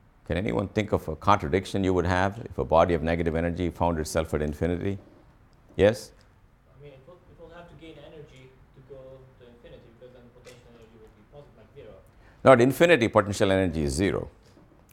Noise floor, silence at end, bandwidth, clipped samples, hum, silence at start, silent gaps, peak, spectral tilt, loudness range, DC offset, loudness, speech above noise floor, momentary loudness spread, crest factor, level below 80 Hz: -58 dBFS; 0.65 s; 16.5 kHz; under 0.1%; none; 0.3 s; none; -4 dBFS; -6 dB/octave; 9 LU; under 0.1%; -24 LUFS; 34 dB; 27 LU; 24 dB; -44 dBFS